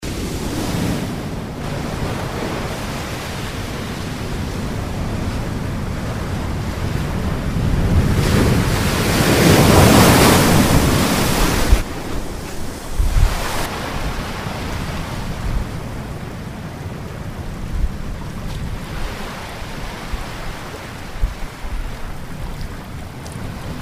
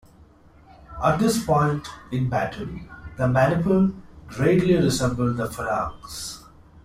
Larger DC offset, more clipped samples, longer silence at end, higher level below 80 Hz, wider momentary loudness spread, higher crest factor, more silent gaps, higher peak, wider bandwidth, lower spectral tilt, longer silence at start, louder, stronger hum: neither; neither; about the same, 0 s vs 0.05 s; first, -26 dBFS vs -46 dBFS; about the same, 17 LU vs 16 LU; about the same, 18 dB vs 16 dB; neither; first, 0 dBFS vs -6 dBFS; about the same, 16 kHz vs 15.5 kHz; about the same, -5 dB/octave vs -6 dB/octave; second, 0 s vs 0.8 s; first, -20 LUFS vs -23 LUFS; neither